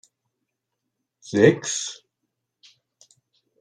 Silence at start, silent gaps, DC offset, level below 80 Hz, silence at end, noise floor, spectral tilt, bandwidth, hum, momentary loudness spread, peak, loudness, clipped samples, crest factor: 1.25 s; none; under 0.1%; -70 dBFS; 1.65 s; -81 dBFS; -4.5 dB/octave; 10.5 kHz; none; 17 LU; -2 dBFS; -21 LUFS; under 0.1%; 24 dB